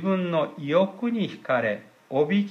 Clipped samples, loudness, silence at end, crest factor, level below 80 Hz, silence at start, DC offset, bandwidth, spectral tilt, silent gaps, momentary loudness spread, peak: under 0.1%; -26 LUFS; 0 s; 16 dB; -78 dBFS; 0 s; under 0.1%; 6.6 kHz; -8 dB/octave; none; 6 LU; -10 dBFS